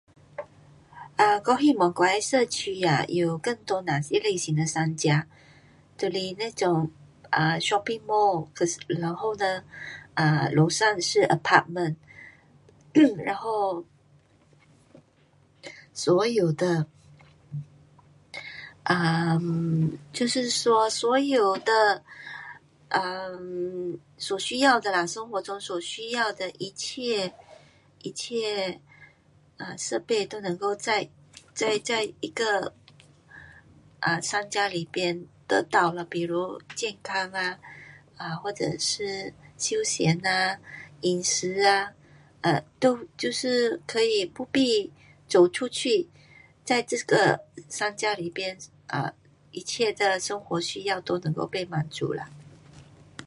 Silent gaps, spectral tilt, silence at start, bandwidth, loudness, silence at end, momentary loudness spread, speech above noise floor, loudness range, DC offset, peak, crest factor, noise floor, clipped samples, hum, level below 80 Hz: none; -4 dB/octave; 0.4 s; 11.5 kHz; -26 LUFS; 0 s; 16 LU; 35 dB; 6 LU; under 0.1%; -2 dBFS; 24 dB; -61 dBFS; under 0.1%; none; -66 dBFS